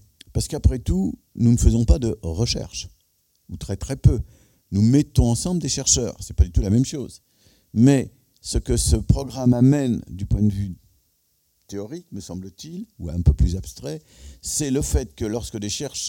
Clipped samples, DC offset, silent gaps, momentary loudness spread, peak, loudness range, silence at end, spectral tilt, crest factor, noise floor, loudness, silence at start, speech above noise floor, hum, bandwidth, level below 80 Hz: under 0.1%; under 0.1%; none; 18 LU; -4 dBFS; 7 LU; 0 s; -5.5 dB/octave; 18 dB; -67 dBFS; -21 LUFS; 0.35 s; 46 dB; none; 17 kHz; -28 dBFS